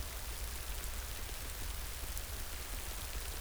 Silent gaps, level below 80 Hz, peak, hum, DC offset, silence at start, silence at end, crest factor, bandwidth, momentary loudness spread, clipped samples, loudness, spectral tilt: none; -44 dBFS; -18 dBFS; none; under 0.1%; 0 s; 0 s; 24 dB; over 20 kHz; 1 LU; under 0.1%; -42 LUFS; -2.5 dB/octave